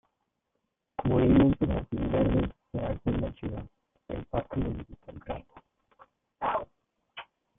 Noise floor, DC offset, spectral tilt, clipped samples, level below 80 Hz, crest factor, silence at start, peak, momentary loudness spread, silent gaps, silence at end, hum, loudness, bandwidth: -81 dBFS; under 0.1%; -11.5 dB/octave; under 0.1%; -42 dBFS; 18 dB; 1 s; -12 dBFS; 24 LU; none; 0.35 s; none; -29 LUFS; 3.8 kHz